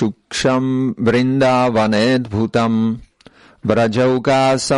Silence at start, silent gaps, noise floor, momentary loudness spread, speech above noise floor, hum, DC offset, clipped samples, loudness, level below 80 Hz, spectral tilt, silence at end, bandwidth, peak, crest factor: 0 s; none; -47 dBFS; 5 LU; 32 dB; none; under 0.1%; under 0.1%; -16 LUFS; -48 dBFS; -5.5 dB/octave; 0 s; 11.5 kHz; -2 dBFS; 14 dB